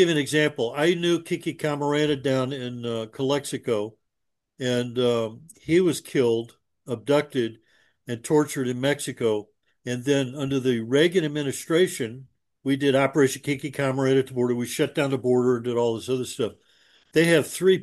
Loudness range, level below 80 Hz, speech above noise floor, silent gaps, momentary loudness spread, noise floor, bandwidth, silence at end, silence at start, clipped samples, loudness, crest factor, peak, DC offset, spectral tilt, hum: 3 LU; -66 dBFS; 57 dB; none; 10 LU; -81 dBFS; 12.5 kHz; 0 s; 0 s; under 0.1%; -24 LUFS; 18 dB; -6 dBFS; under 0.1%; -5 dB/octave; none